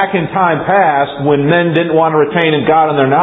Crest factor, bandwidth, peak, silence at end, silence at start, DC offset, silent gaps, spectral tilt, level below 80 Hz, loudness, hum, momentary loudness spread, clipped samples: 12 dB; 4 kHz; 0 dBFS; 0 s; 0 s; under 0.1%; none; -9.5 dB/octave; -48 dBFS; -11 LUFS; none; 3 LU; under 0.1%